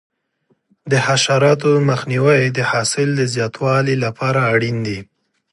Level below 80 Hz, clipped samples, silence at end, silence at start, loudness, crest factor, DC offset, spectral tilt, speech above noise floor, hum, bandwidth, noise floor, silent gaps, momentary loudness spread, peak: -56 dBFS; under 0.1%; 0.5 s; 0.85 s; -16 LUFS; 16 dB; under 0.1%; -5 dB/octave; 48 dB; none; 11.5 kHz; -64 dBFS; none; 6 LU; -2 dBFS